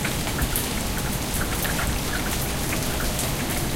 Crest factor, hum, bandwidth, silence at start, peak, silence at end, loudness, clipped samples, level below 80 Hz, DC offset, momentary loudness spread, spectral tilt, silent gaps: 22 dB; none; 17 kHz; 0 s; -4 dBFS; 0 s; -25 LUFS; under 0.1%; -32 dBFS; under 0.1%; 2 LU; -3.5 dB/octave; none